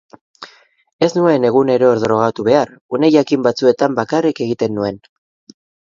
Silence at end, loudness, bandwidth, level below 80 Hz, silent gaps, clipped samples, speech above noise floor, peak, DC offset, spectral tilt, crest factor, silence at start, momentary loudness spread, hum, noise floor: 0.95 s; -15 LUFS; 7.6 kHz; -56 dBFS; 0.93-0.99 s, 2.81-2.89 s; under 0.1%; 29 dB; 0 dBFS; under 0.1%; -6.5 dB/octave; 16 dB; 0.4 s; 7 LU; none; -43 dBFS